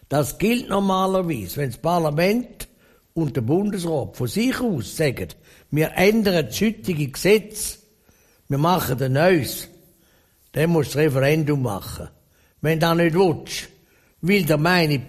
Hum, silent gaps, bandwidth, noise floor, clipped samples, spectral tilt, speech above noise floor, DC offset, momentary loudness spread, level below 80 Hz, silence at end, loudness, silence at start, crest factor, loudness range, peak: none; none; 15 kHz; -58 dBFS; under 0.1%; -5.5 dB/octave; 38 dB; under 0.1%; 13 LU; -48 dBFS; 0 s; -21 LUFS; 0.1 s; 18 dB; 3 LU; -4 dBFS